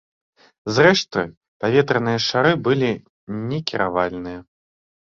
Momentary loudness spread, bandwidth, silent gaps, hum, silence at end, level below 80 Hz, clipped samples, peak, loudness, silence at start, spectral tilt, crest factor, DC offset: 16 LU; 7.6 kHz; 1.37-1.41 s, 1.48-1.60 s, 3.09-3.27 s; none; 0.65 s; -54 dBFS; under 0.1%; -2 dBFS; -19 LUFS; 0.65 s; -5 dB/octave; 20 dB; under 0.1%